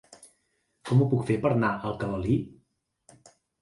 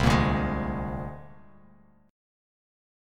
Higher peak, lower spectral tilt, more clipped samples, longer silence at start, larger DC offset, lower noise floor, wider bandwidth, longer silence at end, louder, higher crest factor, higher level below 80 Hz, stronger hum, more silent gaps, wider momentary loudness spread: about the same, -10 dBFS vs -8 dBFS; first, -8 dB/octave vs -6.5 dB/octave; neither; about the same, 0.1 s vs 0 s; neither; first, -74 dBFS vs -58 dBFS; second, 11.5 kHz vs 15 kHz; about the same, 1.1 s vs 1 s; about the same, -26 LUFS vs -28 LUFS; about the same, 18 dB vs 22 dB; second, -52 dBFS vs -38 dBFS; neither; neither; second, 9 LU vs 17 LU